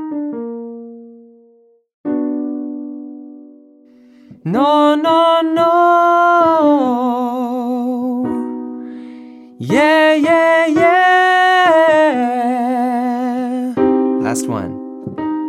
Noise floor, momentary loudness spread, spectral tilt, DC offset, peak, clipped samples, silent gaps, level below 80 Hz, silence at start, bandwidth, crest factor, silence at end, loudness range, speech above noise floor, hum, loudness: -51 dBFS; 18 LU; -5 dB/octave; under 0.1%; 0 dBFS; under 0.1%; 1.94-2.04 s; -60 dBFS; 0 s; 14.5 kHz; 14 dB; 0 s; 14 LU; 39 dB; none; -14 LUFS